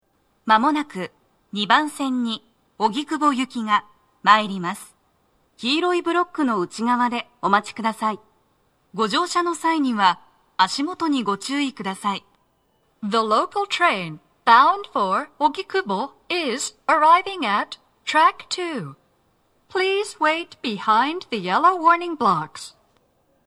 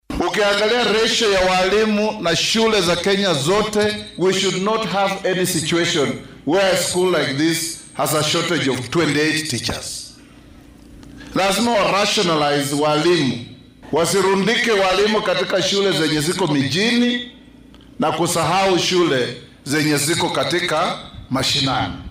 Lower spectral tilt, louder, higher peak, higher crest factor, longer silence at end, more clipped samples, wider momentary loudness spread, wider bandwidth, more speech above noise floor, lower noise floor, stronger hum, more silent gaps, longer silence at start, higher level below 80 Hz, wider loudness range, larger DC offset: about the same, -3.5 dB/octave vs -3.5 dB/octave; second, -21 LUFS vs -18 LUFS; first, 0 dBFS vs -8 dBFS; first, 22 dB vs 10 dB; first, 0.75 s vs 0 s; neither; first, 14 LU vs 7 LU; second, 13.5 kHz vs 16 kHz; first, 44 dB vs 26 dB; first, -65 dBFS vs -44 dBFS; neither; neither; first, 0.45 s vs 0.1 s; second, -70 dBFS vs -46 dBFS; about the same, 3 LU vs 4 LU; neither